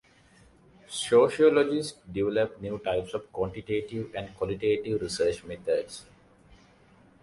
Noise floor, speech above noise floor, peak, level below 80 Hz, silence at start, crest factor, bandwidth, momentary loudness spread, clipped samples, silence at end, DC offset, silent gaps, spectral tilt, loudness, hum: -58 dBFS; 31 dB; -8 dBFS; -56 dBFS; 0.9 s; 20 dB; 11.5 kHz; 14 LU; under 0.1%; 1.2 s; under 0.1%; none; -5 dB/octave; -28 LUFS; none